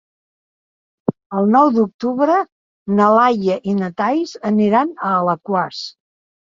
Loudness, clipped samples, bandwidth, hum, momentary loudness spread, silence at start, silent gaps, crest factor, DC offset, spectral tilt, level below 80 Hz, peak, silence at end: -17 LUFS; under 0.1%; 7.4 kHz; none; 12 LU; 1.1 s; 1.26-1.30 s, 1.94-1.99 s, 2.52-2.86 s; 16 dB; under 0.1%; -7 dB/octave; -62 dBFS; -2 dBFS; 0.6 s